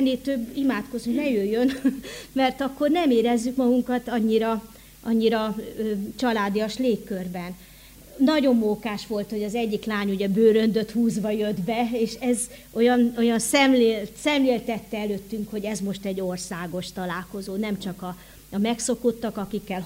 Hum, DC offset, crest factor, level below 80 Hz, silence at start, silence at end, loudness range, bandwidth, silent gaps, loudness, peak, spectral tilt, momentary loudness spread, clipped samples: none; under 0.1%; 18 dB; -54 dBFS; 0 s; 0 s; 7 LU; 16 kHz; none; -24 LUFS; -6 dBFS; -5 dB/octave; 11 LU; under 0.1%